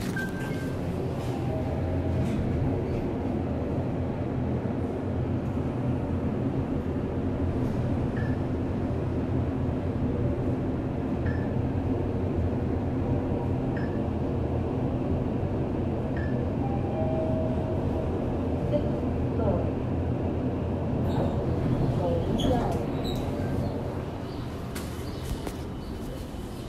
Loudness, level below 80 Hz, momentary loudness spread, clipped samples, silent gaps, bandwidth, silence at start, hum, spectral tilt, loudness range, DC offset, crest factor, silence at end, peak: -29 LUFS; -40 dBFS; 4 LU; under 0.1%; none; 14 kHz; 0 s; none; -8.5 dB/octave; 2 LU; under 0.1%; 16 dB; 0 s; -12 dBFS